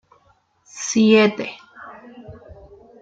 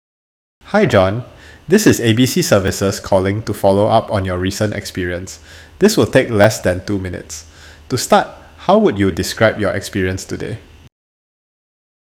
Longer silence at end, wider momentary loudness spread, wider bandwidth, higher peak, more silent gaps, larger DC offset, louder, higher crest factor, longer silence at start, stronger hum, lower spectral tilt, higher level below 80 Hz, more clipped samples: second, 0.5 s vs 1.55 s; first, 27 LU vs 14 LU; second, 7.8 kHz vs 17 kHz; about the same, -2 dBFS vs 0 dBFS; neither; neither; about the same, -17 LUFS vs -15 LUFS; about the same, 20 dB vs 16 dB; about the same, 0.75 s vs 0.65 s; neither; about the same, -4.5 dB/octave vs -5 dB/octave; second, -56 dBFS vs -44 dBFS; neither